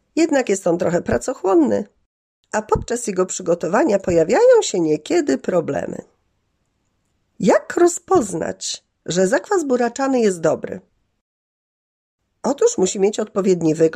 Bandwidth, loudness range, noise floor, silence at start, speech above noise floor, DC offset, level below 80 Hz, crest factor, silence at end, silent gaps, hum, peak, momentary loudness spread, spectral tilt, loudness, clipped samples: 14 kHz; 4 LU; -68 dBFS; 0.15 s; 51 dB; under 0.1%; -48 dBFS; 16 dB; 0 s; 2.06-2.43 s, 11.21-12.18 s; none; -4 dBFS; 10 LU; -5 dB/octave; -18 LUFS; under 0.1%